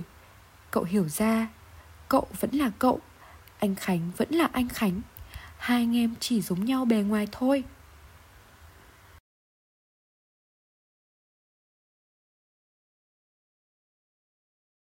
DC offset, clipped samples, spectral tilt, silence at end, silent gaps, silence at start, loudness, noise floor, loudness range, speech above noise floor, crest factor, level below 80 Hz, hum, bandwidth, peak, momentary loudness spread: under 0.1%; under 0.1%; -5.5 dB/octave; 6.25 s; none; 0 s; -27 LUFS; -53 dBFS; 4 LU; 27 dB; 22 dB; -56 dBFS; none; 16.5 kHz; -10 dBFS; 11 LU